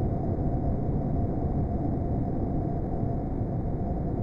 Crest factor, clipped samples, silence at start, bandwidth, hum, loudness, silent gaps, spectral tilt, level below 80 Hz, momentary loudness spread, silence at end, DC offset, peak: 12 dB; under 0.1%; 0 s; 5 kHz; none; -30 LUFS; none; -12.5 dB/octave; -34 dBFS; 2 LU; 0 s; under 0.1%; -16 dBFS